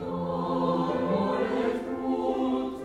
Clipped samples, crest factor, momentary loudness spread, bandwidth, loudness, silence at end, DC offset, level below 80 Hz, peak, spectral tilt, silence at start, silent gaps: under 0.1%; 14 dB; 4 LU; 10 kHz; -28 LUFS; 0 s; under 0.1%; -56 dBFS; -14 dBFS; -8 dB/octave; 0 s; none